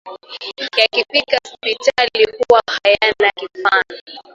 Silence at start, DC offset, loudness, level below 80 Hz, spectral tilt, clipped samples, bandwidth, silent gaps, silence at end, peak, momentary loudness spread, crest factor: 0.05 s; under 0.1%; -15 LUFS; -54 dBFS; -1.5 dB/octave; under 0.1%; 10 kHz; 4.01-4.07 s; 0.15 s; 0 dBFS; 14 LU; 16 dB